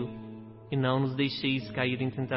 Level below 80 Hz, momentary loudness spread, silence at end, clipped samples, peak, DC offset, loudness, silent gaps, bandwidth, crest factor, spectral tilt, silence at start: -62 dBFS; 16 LU; 0 s; under 0.1%; -14 dBFS; under 0.1%; -30 LUFS; none; 5.8 kHz; 16 dB; -10.5 dB/octave; 0 s